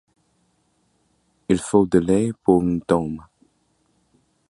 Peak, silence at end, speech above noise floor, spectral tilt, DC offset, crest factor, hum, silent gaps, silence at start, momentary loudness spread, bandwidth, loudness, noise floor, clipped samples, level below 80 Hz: -2 dBFS; 1.3 s; 47 dB; -7 dB/octave; under 0.1%; 20 dB; none; none; 1.5 s; 13 LU; 11.5 kHz; -20 LUFS; -66 dBFS; under 0.1%; -48 dBFS